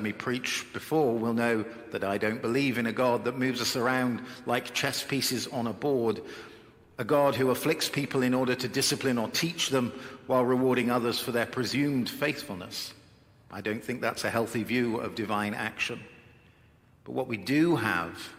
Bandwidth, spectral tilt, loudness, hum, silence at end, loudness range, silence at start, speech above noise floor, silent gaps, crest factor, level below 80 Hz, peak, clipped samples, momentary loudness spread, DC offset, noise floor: 16.5 kHz; -4.5 dB/octave; -29 LUFS; none; 0 s; 4 LU; 0 s; 31 dB; none; 20 dB; -68 dBFS; -10 dBFS; under 0.1%; 11 LU; under 0.1%; -60 dBFS